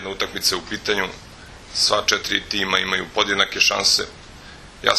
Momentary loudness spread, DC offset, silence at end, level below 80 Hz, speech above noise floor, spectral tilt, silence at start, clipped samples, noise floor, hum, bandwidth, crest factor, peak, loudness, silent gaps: 10 LU; under 0.1%; 0 s; -48 dBFS; 20 dB; -1 dB/octave; 0 s; under 0.1%; -41 dBFS; none; 13 kHz; 22 dB; 0 dBFS; -19 LUFS; none